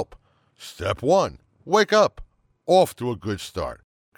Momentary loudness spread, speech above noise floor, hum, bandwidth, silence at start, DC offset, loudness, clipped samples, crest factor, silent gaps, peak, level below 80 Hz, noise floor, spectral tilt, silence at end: 17 LU; 31 dB; none; 17.5 kHz; 0 s; under 0.1%; -22 LUFS; under 0.1%; 18 dB; none; -6 dBFS; -50 dBFS; -53 dBFS; -4.5 dB/octave; 0.45 s